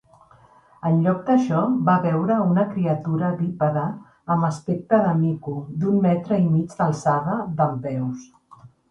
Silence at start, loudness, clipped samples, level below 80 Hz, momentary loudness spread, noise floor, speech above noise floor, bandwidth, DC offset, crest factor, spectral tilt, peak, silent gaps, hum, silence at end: 0.85 s; -22 LUFS; under 0.1%; -60 dBFS; 9 LU; -53 dBFS; 32 dB; 9 kHz; under 0.1%; 16 dB; -9 dB/octave; -6 dBFS; none; none; 0.25 s